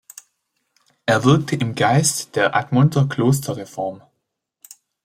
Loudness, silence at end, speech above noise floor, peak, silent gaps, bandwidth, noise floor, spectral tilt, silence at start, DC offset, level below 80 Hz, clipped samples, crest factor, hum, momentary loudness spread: -19 LUFS; 1.05 s; 58 dB; -2 dBFS; none; 15.5 kHz; -76 dBFS; -5 dB/octave; 1.05 s; under 0.1%; -58 dBFS; under 0.1%; 18 dB; none; 12 LU